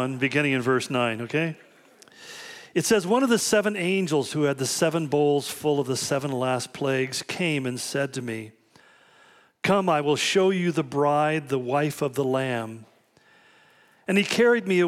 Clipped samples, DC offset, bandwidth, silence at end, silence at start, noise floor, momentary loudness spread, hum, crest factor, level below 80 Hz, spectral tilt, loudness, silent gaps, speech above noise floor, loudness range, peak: under 0.1%; under 0.1%; 16 kHz; 0 s; 0 s; -59 dBFS; 10 LU; none; 14 dB; -70 dBFS; -4.5 dB/octave; -24 LUFS; none; 35 dB; 4 LU; -10 dBFS